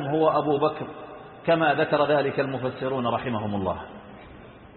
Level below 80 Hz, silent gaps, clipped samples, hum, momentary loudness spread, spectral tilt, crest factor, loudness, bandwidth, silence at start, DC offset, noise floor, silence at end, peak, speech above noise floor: -54 dBFS; none; under 0.1%; none; 20 LU; -10.5 dB/octave; 16 dB; -25 LUFS; 4.3 kHz; 0 s; under 0.1%; -46 dBFS; 0 s; -8 dBFS; 22 dB